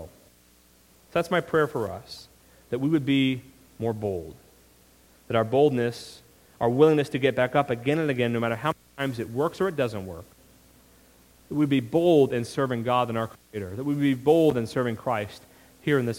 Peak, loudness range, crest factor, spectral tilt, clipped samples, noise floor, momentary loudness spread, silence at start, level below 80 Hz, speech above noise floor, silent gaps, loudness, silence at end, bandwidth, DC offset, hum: -6 dBFS; 5 LU; 20 dB; -6.5 dB/octave; under 0.1%; -58 dBFS; 15 LU; 0 s; -60 dBFS; 34 dB; none; -25 LUFS; 0 s; 17 kHz; under 0.1%; none